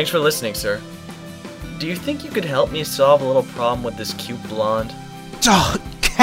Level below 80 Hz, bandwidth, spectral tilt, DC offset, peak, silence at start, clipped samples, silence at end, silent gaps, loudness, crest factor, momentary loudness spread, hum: -38 dBFS; 16.5 kHz; -3.5 dB/octave; under 0.1%; 0 dBFS; 0 s; under 0.1%; 0 s; none; -20 LUFS; 20 dB; 20 LU; none